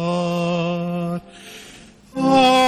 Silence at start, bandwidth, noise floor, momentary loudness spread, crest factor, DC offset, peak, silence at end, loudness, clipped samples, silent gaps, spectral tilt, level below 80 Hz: 0 s; 13 kHz; -44 dBFS; 23 LU; 16 dB; under 0.1%; -4 dBFS; 0 s; -20 LUFS; under 0.1%; none; -5.5 dB/octave; -54 dBFS